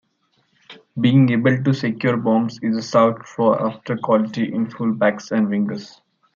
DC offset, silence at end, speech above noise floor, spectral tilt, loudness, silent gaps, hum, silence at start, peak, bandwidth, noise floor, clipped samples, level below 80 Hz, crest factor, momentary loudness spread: under 0.1%; 0.5 s; 47 dB; -7.5 dB/octave; -19 LUFS; none; none; 0.7 s; -2 dBFS; 7.4 kHz; -65 dBFS; under 0.1%; -64 dBFS; 16 dB; 8 LU